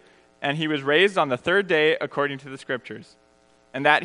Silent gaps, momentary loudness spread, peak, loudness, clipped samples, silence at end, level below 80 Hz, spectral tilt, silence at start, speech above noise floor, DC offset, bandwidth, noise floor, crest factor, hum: none; 16 LU; -2 dBFS; -22 LUFS; under 0.1%; 0 s; -68 dBFS; -5 dB/octave; 0.4 s; 36 dB; under 0.1%; 10.5 kHz; -59 dBFS; 22 dB; none